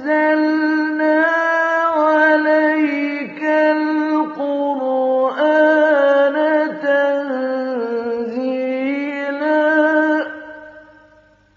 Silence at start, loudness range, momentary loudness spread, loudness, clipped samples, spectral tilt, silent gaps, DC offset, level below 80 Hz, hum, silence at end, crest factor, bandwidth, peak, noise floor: 0 s; 4 LU; 8 LU; -16 LUFS; under 0.1%; -1.5 dB/octave; none; under 0.1%; -70 dBFS; none; 0.75 s; 14 dB; 6.8 kHz; -2 dBFS; -51 dBFS